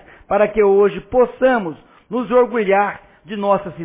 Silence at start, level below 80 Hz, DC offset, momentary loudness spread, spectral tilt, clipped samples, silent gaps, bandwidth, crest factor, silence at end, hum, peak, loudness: 0.3 s; -48 dBFS; under 0.1%; 12 LU; -10 dB/octave; under 0.1%; none; 3.9 kHz; 14 dB; 0 s; none; -4 dBFS; -17 LUFS